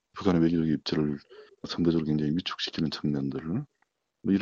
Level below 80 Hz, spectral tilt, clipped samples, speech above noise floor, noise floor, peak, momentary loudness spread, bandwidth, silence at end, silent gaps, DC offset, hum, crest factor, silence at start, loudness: -56 dBFS; -7 dB/octave; under 0.1%; 32 dB; -60 dBFS; -10 dBFS; 11 LU; 7.4 kHz; 0 s; none; under 0.1%; none; 18 dB; 0.15 s; -29 LUFS